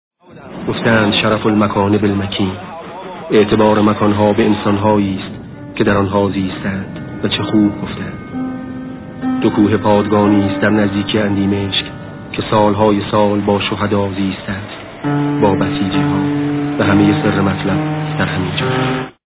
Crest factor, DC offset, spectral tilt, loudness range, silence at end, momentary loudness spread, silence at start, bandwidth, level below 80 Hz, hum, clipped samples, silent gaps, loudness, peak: 14 dB; under 0.1%; -11 dB/octave; 3 LU; 0.15 s; 13 LU; 0.3 s; 4 kHz; -40 dBFS; none; under 0.1%; none; -15 LUFS; 0 dBFS